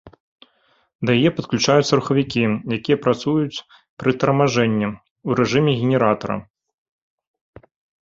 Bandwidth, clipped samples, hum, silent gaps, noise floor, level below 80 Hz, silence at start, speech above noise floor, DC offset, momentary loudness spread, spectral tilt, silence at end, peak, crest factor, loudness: 7.8 kHz; under 0.1%; none; 0.20-0.38 s, 0.95-0.99 s, 3.89-3.97 s, 5.11-5.16 s; -62 dBFS; -54 dBFS; 0.05 s; 43 dB; under 0.1%; 10 LU; -6 dB/octave; 1.6 s; 0 dBFS; 20 dB; -19 LUFS